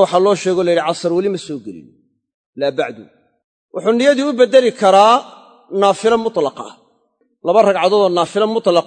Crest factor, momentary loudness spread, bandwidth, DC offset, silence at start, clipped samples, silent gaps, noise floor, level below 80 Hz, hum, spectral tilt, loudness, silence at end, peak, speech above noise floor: 16 dB; 14 LU; 9.4 kHz; under 0.1%; 0 s; under 0.1%; 2.34-2.53 s, 3.44-3.69 s; -62 dBFS; -64 dBFS; none; -4.5 dB/octave; -14 LUFS; 0.05 s; 0 dBFS; 48 dB